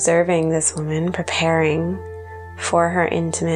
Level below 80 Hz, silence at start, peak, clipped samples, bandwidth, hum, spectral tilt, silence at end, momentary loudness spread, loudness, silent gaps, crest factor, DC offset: -48 dBFS; 0 s; -4 dBFS; under 0.1%; 11.5 kHz; none; -4.5 dB/octave; 0 s; 13 LU; -19 LUFS; none; 16 dB; under 0.1%